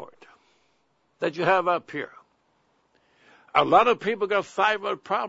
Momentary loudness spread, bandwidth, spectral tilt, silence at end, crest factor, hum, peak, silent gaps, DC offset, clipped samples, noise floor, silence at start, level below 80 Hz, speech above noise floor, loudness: 13 LU; 8 kHz; -5 dB/octave; 0 s; 22 dB; none; -4 dBFS; none; under 0.1%; under 0.1%; -69 dBFS; 0 s; -68 dBFS; 46 dB; -23 LUFS